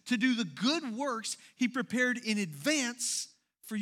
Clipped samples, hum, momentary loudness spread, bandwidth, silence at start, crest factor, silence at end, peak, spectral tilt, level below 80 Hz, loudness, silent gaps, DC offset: under 0.1%; none; 7 LU; 16 kHz; 0.05 s; 18 dB; 0 s; -16 dBFS; -3 dB/octave; -88 dBFS; -32 LUFS; none; under 0.1%